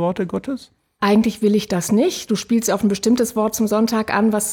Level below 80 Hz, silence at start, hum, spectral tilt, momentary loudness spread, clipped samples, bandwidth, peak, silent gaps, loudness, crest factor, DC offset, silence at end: -52 dBFS; 0 s; none; -5 dB/octave; 7 LU; under 0.1%; 19.5 kHz; -6 dBFS; none; -19 LUFS; 12 dB; under 0.1%; 0 s